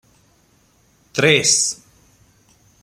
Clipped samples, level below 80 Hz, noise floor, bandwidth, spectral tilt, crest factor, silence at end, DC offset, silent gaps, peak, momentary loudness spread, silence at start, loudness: under 0.1%; -60 dBFS; -57 dBFS; 15.5 kHz; -2 dB/octave; 22 dB; 1.1 s; under 0.1%; none; 0 dBFS; 15 LU; 1.15 s; -15 LUFS